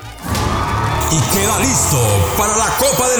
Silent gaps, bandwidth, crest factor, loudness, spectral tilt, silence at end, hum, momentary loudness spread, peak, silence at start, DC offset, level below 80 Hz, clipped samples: none; over 20 kHz; 12 dB; -14 LUFS; -3.5 dB/octave; 0 s; none; 5 LU; -4 dBFS; 0 s; under 0.1%; -30 dBFS; under 0.1%